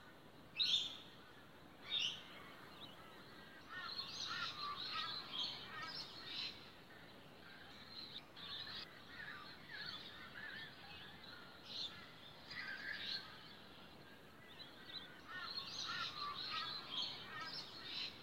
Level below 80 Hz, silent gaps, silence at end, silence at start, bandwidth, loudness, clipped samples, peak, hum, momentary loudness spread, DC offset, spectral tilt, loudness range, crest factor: -78 dBFS; none; 0 s; 0 s; 16 kHz; -46 LUFS; under 0.1%; -26 dBFS; none; 16 LU; under 0.1%; -1.5 dB/octave; 6 LU; 24 dB